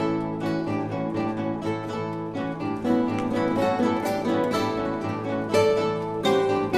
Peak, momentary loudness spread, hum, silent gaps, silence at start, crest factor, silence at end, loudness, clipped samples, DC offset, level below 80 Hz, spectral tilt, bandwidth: -8 dBFS; 7 LU; none; none; 0 s; 16 dB; 0 s; -25 LUFS; under 0.1%; under 0.1%; -54 dBFS; -6.5 dB/octave; 15 kHz